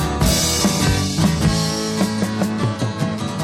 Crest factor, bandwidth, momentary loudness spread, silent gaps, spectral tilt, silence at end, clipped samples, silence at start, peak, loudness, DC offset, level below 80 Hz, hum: 16 dB; 17 kHz; 6 LU; none; -4.5 dB/octave; 0 s; under 0.1%; 0 s; -2 dBFS; -19 LUFS; under 0.1%; -30 dBFS; none